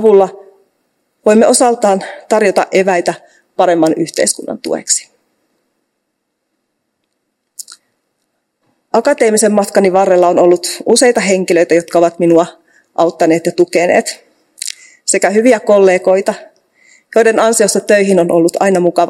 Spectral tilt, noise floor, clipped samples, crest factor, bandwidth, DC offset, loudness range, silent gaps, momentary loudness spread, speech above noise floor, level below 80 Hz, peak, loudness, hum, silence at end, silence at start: -4 dB/octave; -70 dBFS; 0.5%; 12 dB; 16 kHz; under 0.1%; 8 LU; none; 12 LU; 59 dB; -62 dBFS; 0 dBFS; -11 LUFS; none; 0 s; 0 s